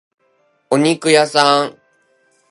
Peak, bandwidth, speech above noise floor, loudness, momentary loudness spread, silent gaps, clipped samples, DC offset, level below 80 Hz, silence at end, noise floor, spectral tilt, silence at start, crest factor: 0 dBFS; 11.5 kHz; 47 dB; -14 LUFS; 7 LU; none; under 0.1%; under 0.1%; -66 dBFS; 0.8 s; -60 dBFS; -3.5 dB/octave; 0.7 s; 18 dB